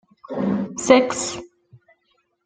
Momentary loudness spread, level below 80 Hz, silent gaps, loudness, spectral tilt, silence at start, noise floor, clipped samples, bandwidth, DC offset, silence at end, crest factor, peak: 16 LU; -60 dBFS; none; -20 LUFS; -4 dB/octave; 0.3 s; -68 dBFS; under 0.1%; 9.6 kHz; under 0.1%; 1 s; 20 dB; -2 dBFS